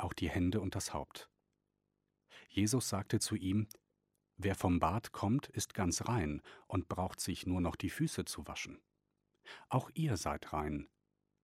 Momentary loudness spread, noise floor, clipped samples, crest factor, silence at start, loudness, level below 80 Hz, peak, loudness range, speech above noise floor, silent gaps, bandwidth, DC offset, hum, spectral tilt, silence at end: 11 LU; -85 dBFS; under 0.1%; 22 dB; 0 s; -38 LUFS; -56 dBFS; -16 dBFS; 4 LU; 48 dB; none; 16 kHz; under 0.1%; 50 Hz at -60 dBFS; -5 dB/octave; 0.6 s